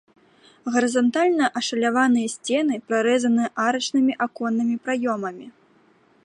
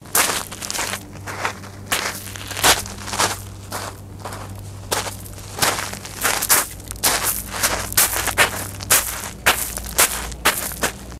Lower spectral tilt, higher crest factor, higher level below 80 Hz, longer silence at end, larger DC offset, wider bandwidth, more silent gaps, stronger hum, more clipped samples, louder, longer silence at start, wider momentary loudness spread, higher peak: first, -3.5 dB/octave vs -1 dB/octave; second, 16 dB vs 22 dB; second, -76 dBFS vs -40 dBFS; first, 0.75 s vs 0 s; neither; second, 11 kHz vs 16 kHz; neither; neither; neither; about the same, -22 LUFS vs -20 LUFS; first, 0.65 s vs 0 s; second, 6 LU vs 16 LU; second, -8 dBFS vs 0 dBFS